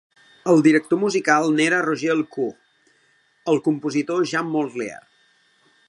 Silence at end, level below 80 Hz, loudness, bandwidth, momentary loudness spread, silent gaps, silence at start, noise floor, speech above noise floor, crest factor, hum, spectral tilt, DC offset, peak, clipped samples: 0.9 s; -74 dBFS; -20 LUFS; 11 kHz; 12 LU; none; 0.45 s; -61 dBFS; 42 dB; 20 dB; none; -5 dB/octave; under 0.1%; -2 dBFS; under 0.1%